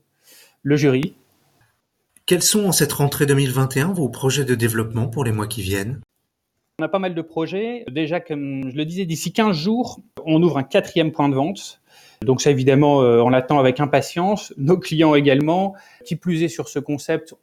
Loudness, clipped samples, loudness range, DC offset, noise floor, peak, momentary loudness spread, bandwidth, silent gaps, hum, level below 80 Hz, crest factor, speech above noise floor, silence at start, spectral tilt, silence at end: -19 LUFS; under 0.1%; 8 LU; under 0.1%; -75 dBFS; -2 dBFS; 11 LU; 16.5 kHz; none; none; -56 dBFS; 18 dB; 56 dB; 0.65 s; -5 dB/octave; 0.2 s